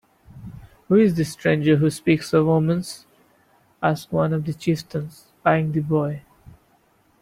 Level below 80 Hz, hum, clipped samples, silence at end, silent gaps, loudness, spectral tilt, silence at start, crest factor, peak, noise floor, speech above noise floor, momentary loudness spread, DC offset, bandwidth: -54 dBFS; none; under 0.1%; 0.7 s; none; -21 LUFS; -7 dB/octave; 0.35 s; 20 dB; -4 dBFS; -60 dBFS; 40 dB; 19 LU; under 0.1%; 15 kHz